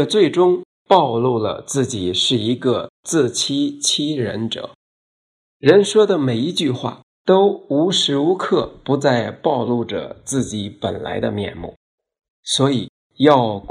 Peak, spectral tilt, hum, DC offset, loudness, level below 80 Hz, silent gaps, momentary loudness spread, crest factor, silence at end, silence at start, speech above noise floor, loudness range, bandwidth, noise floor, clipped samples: 0 dBFS; -4.5 dB/octave; none; under 0.1%; -18 LUFS; -54 dBFS; 0.65-0.86 s, 2.89-3.03 s, 4.75-5.60 s, 7.03-7.25 s, 11.76-11.98 s, 12.30-12.43 s, 12.89-13.10 s; 12 LU; 18 dB; 0 s; 0 s; over 72 dB; 6 LU; 13 kHz; under -90 dBFS; under 0.1%